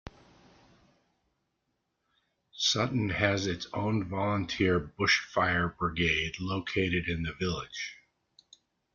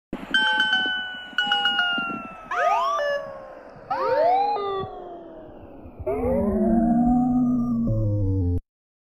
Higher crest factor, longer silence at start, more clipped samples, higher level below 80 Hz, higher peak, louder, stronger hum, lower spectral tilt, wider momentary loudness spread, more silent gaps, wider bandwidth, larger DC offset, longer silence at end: first, 22 dB vs 16 dB; about the same, 0.05 s vs 0.1 s; neither; second, -54 dBFS vs -42 dBFS; about the same, -10 dBFS vs -8 dBFS; second, -30 LUFS vs -23 LUFS; neither; second, -4.5 dB/octave vs -6 dB/octave; second, 7 LU vs 20 LU; neither; second, 7.4 kHz vs 8.8 kHz; neither; first, 1 s vs 0.55 s